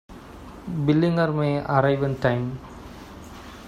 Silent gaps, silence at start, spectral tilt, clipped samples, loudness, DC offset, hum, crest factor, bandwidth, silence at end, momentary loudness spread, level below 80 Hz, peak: none; 0.1 s; -8 dB/octave; under 0.1%; -23 LUFS; under 0.1%; none; 20 dB; 11.5 kHz; 0 s; 21 LU; -48 dBFS; -6 dBFS